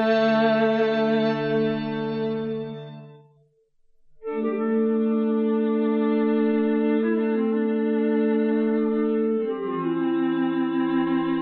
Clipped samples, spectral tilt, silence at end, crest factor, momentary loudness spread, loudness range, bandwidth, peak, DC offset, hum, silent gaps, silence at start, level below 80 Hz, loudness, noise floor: under 0.1%; -8.5 dB/octave; 0 s; 14 dB; 6 LU; 6 LU; 5.6 kHz; -10 dBFS; under 0.1%; none; none; 0 s; -66 dBFS; -23 LUFS; -62 dBFS